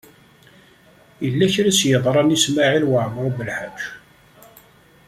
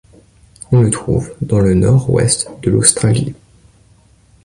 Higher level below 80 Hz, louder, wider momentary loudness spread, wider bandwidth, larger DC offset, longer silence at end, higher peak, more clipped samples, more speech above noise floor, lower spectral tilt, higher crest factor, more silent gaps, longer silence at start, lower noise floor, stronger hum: second, -56 dBFS vs -36 dBFS; second, -18 LUFS vs -13 LUFS; first, 12 LU vs 8 LU; about the same, 15.5 kHz vs 14.5 kHz; neither; about the same, 1.1 s vs 1.1 s; about the same, -2 dBFS vs 0 dBFS; neither; about the same, 33 dB vs 36 dB; second, -4 dB/octave vs -5.5 dB/octave; about the same, 18 dB vs 16 dB; neither; first, 1.2 s vs 0.7 s; about the same, -51 dBFS vs -49 dBFS; neither